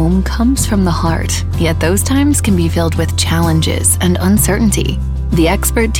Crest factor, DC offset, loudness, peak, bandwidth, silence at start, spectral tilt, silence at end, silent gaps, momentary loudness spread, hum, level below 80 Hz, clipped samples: 10 dB; under 0.1%; -13 LUFS; -2 dBFS; 17 kHz; 0 s; -5 dB/octave; 0 s; none; 4 LU; none; -20 dBFS; under 0.1%